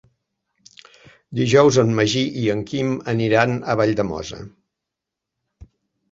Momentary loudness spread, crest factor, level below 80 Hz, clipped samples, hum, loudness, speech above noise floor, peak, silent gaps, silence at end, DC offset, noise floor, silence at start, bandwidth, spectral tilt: 14 LU; 20 dB; -52 dBFS; under 0.1%; none; -19 LUFS; 65 dB; -2 dBFS; none; 0.5 s; under 0.1%; -84 dBFS; 1.3 s; 7.8 kHz; -5.5 dB/octave